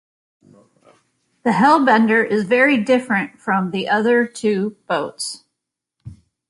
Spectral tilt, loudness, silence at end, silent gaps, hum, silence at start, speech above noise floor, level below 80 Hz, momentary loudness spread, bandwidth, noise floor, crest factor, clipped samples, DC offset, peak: -5 dB/octave; -17 LUFS; 0.35 s; none; none; 1.45 s; 64 dB; -60 dBFS; 11 LU; 11.5 kHz; -81 dBFS; 18 dB; under 0.1%; under 0.1%; -2 dBFS